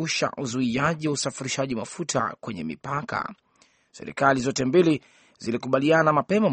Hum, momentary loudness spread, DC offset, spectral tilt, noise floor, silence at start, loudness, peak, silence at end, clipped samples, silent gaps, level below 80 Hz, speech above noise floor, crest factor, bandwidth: none; 13 LU; under 0.1%; -5 dB/octave; -58 dBFS; 0 s; -24 LUFS; -4 dBFS; 0 s; under 0.1%; none; -60 dBFS; 34 dB; 20 dB; 8.8 kHz